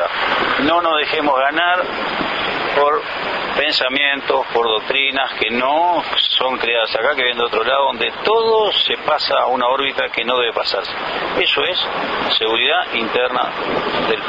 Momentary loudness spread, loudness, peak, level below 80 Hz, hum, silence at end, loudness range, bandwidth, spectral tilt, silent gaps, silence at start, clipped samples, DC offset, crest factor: 5 LU; -16 LUFS; -2 dBFS; -52 dBFS; none; 0 s; 1 LU; 7.8 kHz; -4 dB/octave; none; 0 s; under 0.1%; under 0.1%; 16 dB